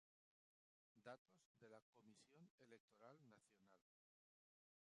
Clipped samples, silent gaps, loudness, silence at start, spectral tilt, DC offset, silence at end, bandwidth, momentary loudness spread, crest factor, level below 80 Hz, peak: under 0.1%; 1.18-1.25 s, 1.46-1.55 s, 1.82-1.93 s, 2.50-2.58 s, 2.80-2.88 s; -67 LUFS; 0.95 s; -5 dB/octave; under 0.1%; 1.15 s; 10 kHz; 5 LU; 24 dB; under -90 dBFS; -48 dBFS